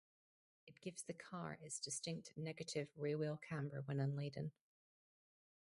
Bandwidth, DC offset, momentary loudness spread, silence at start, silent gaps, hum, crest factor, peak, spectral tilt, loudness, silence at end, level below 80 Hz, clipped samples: 11.5 kHz; under 0.1%; 8 LU; 0.65 s; none; none; 18 dB; -30 dBFS; -5 dB/octave; -47 LUFS; 1.1 s; -82 dBFS; under 0.1%